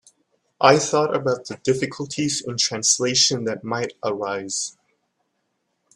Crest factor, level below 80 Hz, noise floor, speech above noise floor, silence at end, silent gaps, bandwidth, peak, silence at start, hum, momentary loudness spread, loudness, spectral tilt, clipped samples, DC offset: 22 dB; -64 dBFS; -73 dBFS; 52 dB; 1.25 s; none; 13 kHz; 0 dBFS; 0.6 s; none; 10 LU; -21 LUFS; -2.5 dB/octave; under 0.1%; under 0.1%